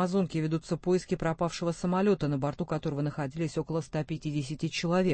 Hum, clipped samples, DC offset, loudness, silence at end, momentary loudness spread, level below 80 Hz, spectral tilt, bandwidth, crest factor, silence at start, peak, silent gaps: none; under 0.1%; under 0.1%; -31 LUFS; 0 s; 6 LU; -54 dBFS; -6.5 dB/octave; 8.8 kHz; 14 dB; 0 s; -14 dBFS; none